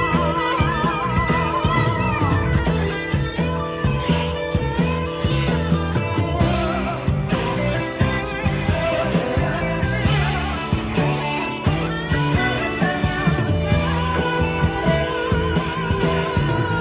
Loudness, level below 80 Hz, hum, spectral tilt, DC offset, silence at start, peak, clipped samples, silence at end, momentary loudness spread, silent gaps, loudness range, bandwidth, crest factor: -21 LUFS; -30 dBFS; none; -10.5 dB/octave; under 0.1%; 0 s; -4 dBFS; under 0.1%; 0 s; 3 LU; none; 1 LU; 4 kHz; 16 dB